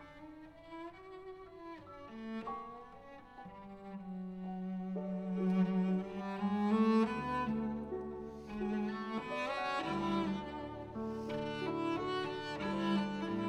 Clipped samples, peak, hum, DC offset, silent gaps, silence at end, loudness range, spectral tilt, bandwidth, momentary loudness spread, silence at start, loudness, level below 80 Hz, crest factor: under 0.1%; -20 dBFS; none; under 0.1%; none; 0 s; 14 LU; -7.5 dB/octave; 9.6 kHz; 18 LU; 0 s; -37 LUFS; -62 dBFS; 18 dB